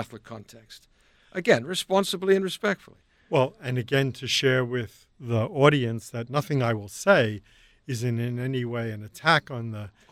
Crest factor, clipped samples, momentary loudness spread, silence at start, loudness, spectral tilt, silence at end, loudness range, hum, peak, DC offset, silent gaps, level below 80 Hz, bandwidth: 22 dB; under 0.1%; 15 LU; 0 s; -25 LUFS; -5 dB/octave; 0.25 s; 2 LU; none; -6 dBFS; under 0.1%; none; -62 dBFS; 15.5 kHz